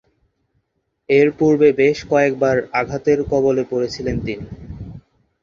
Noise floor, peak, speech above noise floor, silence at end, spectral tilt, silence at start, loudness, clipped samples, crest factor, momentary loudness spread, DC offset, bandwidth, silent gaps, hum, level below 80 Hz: -70 dBFS; -2 dBFS; 54 dB; 0.45 s; -6.5 dB/octave; 1.1 s; -17 LUFS; under 0.1%; 16 dB; 20 LU; under 0.1%; 7.4 kHz; none; none; -44 dBFS